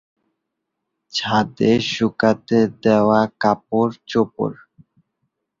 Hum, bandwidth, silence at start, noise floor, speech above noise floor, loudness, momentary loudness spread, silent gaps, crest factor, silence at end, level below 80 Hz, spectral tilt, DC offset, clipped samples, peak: none; 7.6 kHz; 1.15 s; -78 dBFS; 60 dB; -19 LUFS; 7 LU; none; 18 dB; 1.05 s; -56 dBFS; -6 dB/octave; under 0.1%; under 0.1%; -2 dBFS